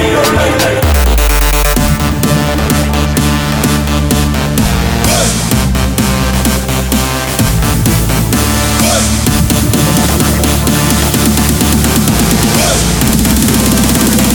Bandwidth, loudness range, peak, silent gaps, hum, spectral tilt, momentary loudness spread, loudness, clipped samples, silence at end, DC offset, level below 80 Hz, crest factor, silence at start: over 20 kHz; 2 LU; 0 dBFS; none; none; -4 dB/octave; 3 LU; -10 LUFS; under 0.1%; 0 s; 0.4%; -16 dBFS; 10 dB; 0 s